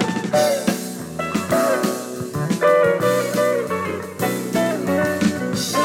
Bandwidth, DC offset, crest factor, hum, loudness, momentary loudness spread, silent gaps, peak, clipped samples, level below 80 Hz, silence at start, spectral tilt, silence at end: 17.5 kHz; under 0.1%; 16 dB; none; -20 LUFS; 10 LU; none; -4 dBFS; under 0.1%; -56 dBFS; 0 s; -5 dB/octave; 0 s